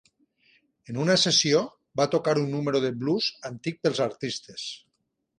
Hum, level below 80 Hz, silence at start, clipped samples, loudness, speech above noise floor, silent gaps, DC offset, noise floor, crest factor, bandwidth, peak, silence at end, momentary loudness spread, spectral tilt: none; -68 dBFS; 0.9 s; under 0.1%; -25 LUFS; 52 dB; none; under 0.1%; -78 dBFS; 18 dB; 11 kHz; -8 dBFS; 0.6 s; 16 LU; -4 dB/octave